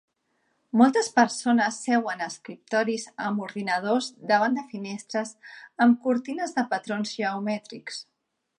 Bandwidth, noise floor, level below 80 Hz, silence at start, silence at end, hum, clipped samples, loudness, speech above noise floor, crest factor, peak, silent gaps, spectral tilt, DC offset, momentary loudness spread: 11 kHz; -73 dBFS; -80 dBFS; 0.75 s; 0.55 s; none; under 0.1%; -25 LUFS; 47 dB; 20 dB; -6 dBFS; none; -4 dB/octave; under 0.1%; 15 LU